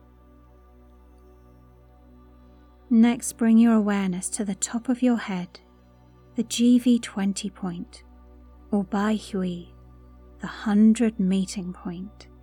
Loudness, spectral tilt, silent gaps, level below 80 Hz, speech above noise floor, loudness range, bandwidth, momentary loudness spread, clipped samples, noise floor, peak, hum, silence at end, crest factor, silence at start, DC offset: -23 LUFS; -5.5 dB/octave; none; -52 dBFS; 31 dB; 6 LU; 14 kHz; 17 LU; under 0.1%; -53 dBFS; -10 dBFS; 60 Hz at -55 dBFS; 0.2 s; 16 dB; 2.9 s; under 0.1%